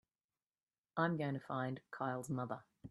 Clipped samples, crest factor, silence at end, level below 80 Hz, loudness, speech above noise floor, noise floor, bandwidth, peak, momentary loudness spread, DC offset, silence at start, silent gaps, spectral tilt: under 0.1%; 22 dB; 0 s; -78 dBFS; -41 LUFS; over 49 dB; under -90 dBFS; 12 kHz; -20 dBFS; 9 LU; under 0.1%; 0.95 s; none; -7 dB/octave